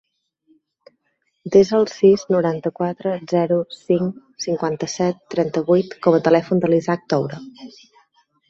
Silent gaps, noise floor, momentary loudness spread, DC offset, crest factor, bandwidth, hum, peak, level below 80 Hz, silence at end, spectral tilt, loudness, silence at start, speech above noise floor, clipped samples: none; -70 dBFS; 10 LU; under 0.1%; 18 dB; 7.8 kHz; none; -2 dBFS; -62 dBFS; 0.8 s; -6.5 dB/octave; -19 LUFS; 1.45 s; 52 dB; under 0.1%